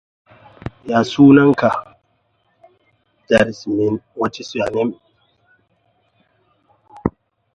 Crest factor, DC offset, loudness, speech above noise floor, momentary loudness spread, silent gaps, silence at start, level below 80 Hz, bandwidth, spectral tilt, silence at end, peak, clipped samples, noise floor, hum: 18 dB; under 0.1%; -16 LUFS; 49 dB; 16 LU; none; 0.85 s; -48 dBFS; 8.6 kHz; -7 dB/octave; 0.45 s; 0 dBFS; under 0.1%; -64 dBFS; none